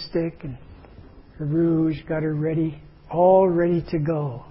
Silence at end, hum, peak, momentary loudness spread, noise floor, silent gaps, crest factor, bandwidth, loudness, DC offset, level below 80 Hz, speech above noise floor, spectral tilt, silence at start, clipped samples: 0 s; none; -6 dBFS; 14 LU; -46 dBFS; none; 16 dB; 5.8 kHz; -22 LUFS; under 0.1%; -48 dBFS; 24 dB; -12.5 dB/octave; 0 s; under 0.1%